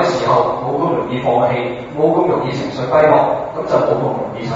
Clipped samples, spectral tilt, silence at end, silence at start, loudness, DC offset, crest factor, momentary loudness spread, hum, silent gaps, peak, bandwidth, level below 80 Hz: under 0.1%; -7 dB/octave; 0 s; 0 s; -16 LUFS; under 0.1%; 16 dB; 9 LU; none; none; 0 dBFS; 7.8 kHz; -48 dBFS